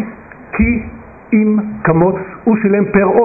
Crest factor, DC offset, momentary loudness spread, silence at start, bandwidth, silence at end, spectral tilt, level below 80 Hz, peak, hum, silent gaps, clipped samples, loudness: 12 dB; under 0.1%; 10 LU; 0 s; 2.7 kHz; 0 s; -13 dB/octave; -32 dBFS; -2 dBFS; none; none; under 0.1%; -14 LUFS